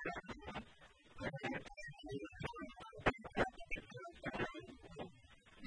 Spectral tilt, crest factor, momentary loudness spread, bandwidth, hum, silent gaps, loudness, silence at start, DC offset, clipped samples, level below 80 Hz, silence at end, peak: -5.5 dB/octave; 28 dB; 16 LU; 10.5 kHz; none; none; -46 LUFS; 0 s; under 0.1%; under 0.1%; -60 dBFS; 0 s; -18 dBFS